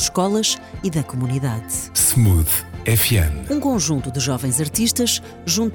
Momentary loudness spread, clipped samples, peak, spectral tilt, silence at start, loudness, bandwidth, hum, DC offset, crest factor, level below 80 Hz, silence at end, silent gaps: 8 LU; under 0.1%; -4 dBFS; -4 dB/octave; 0 s; -19 LUFS; 19.5 kHz; none; under 0.1%; 16 dB; -36 dBFS; 0 s; none